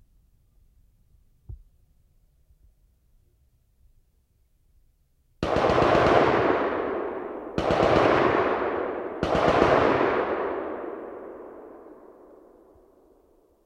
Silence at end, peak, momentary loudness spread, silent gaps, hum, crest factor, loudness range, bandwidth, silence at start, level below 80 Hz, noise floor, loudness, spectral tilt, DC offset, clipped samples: 1.7 s; -4 dBFS; 19 LU; none; none; 24 dB; 11 LU; 10.5 kHz; 1.5 s; -48 dBFS; -65 dBFS; -23 LUFS; -6.5 dB/octave; under 0.1%; under 0.1%